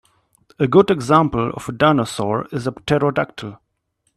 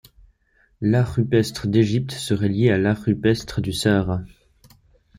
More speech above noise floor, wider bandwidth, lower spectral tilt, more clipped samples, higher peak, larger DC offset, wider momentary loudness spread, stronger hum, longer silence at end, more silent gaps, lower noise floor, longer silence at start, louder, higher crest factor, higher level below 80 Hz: first, 52 dB vs 42 dB; second, 13 kHz vs 15.5 kHz; about the same, -6.5 dB/octave vs -6.5 dB/octave; neither; first, 0 dBFS vs -4 dBFS; neither; first, 11 LU vs 7 LU; neither; second, 0.6 s vs 0.9 s; neither; first, -69 dBFS vs -61 dBFS; second, 0.6 s vs 0.8 s; first, -18 LUFS vs -21 LUFS; about the same, 18 dB vs 18 dB; about the same, -50 dBFS vs -46 dBFS